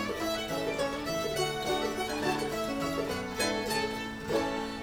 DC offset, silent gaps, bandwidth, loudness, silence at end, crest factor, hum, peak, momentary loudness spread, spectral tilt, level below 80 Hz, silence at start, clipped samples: under 0.1%; none; over 20 kHz; -32 LUFS; 0 s; 16 dB; none; -16 dBFS; 2 LU; -3.5 dB/octave; -52 dBFS; 0 s; under 0.1%